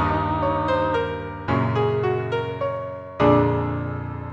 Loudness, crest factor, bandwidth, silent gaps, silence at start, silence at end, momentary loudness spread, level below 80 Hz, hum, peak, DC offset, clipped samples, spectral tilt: -23 LUFS; 18 dB; 7.2 kHz; none; 0 s; 0 s; 11 LU; -42 dBFS; none; -4 dBFS; under 0.1%; under 0.1%; -8.5 dB/octave